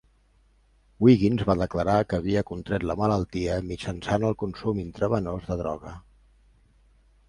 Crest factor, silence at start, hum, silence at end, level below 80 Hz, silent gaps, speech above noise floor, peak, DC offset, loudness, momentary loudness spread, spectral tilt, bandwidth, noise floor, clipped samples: 20 dB; 1 s; none; 1.3 s; -44 dBFS; none; 37 dB; -6 dBFS; under 0.1%; -26 LUFS; 10 LU; -7.5 dB/octave; 11 kHz; -62 dBFS; under 0.1%